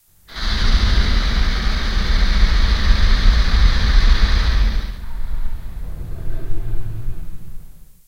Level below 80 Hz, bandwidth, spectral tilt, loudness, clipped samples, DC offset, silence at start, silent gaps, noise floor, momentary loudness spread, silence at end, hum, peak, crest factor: -16 dBFS; 7.4 kHz; -5 dB/octave; -20 LUFS; under 0.1%; under 0.1%; 0.3 s; none; -36 dBFS; 15 LU; 0.35 s; none; 0 dBFS; 14 dB